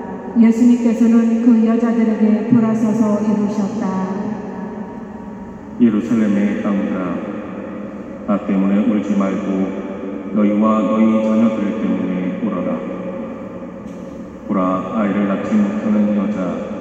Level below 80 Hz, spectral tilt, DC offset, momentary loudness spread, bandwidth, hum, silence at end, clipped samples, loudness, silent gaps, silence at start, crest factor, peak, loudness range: -50 dBFS; -8.5 dB/octave; under 0.1%; 16 LU; 8 kHz; none; 0 s; under 0.1%; -17 LUFS; none; 0 s; 16 dB; 0 dBFS; 6 LU